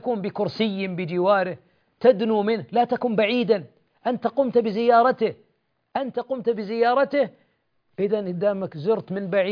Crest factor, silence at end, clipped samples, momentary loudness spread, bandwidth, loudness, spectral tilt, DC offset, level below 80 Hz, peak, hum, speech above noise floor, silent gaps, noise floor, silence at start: 18 dB; 0 s; under 0.1%; 9 LU; 5.2 kHz; -23 LUFS; -8.5 dB/octave; under 0.1%; -70 dBFS; -4 dBFS; none; 48 dB; none; -70 dBFS; 0 s